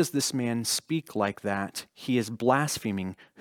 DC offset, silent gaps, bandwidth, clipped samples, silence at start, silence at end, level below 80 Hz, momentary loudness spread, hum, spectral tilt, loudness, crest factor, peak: under 0.1%; none; 20 kHz; under 0.1%; 0 s; 0.15 s; -68 dBFS; 9 LU; none; -4 dB/octave; -29 LUFS; 20 dB; -8 dBFS